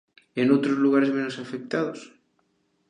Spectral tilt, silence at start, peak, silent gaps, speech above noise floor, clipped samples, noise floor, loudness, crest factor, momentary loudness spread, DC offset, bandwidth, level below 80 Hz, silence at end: -6.5 dB/octave; 0.35 s; -8 dBFS; none; 46 dB; under 0.1%; -70 dBFS; -24 LUFS; 18 dB; 14 LU; under 0.1%; 9.6 kHz; -76 dBFS; 0.8 s